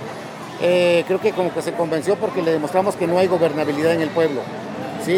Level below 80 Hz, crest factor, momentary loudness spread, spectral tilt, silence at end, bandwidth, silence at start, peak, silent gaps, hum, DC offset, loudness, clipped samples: -66 dBFS; 16 dB; 12 LU; -5.5 dB/octave; 0 s; 16 kHz; 0 s; -4 dBFS; none; none; under 0.1%; -20 LUFS; under 0.1%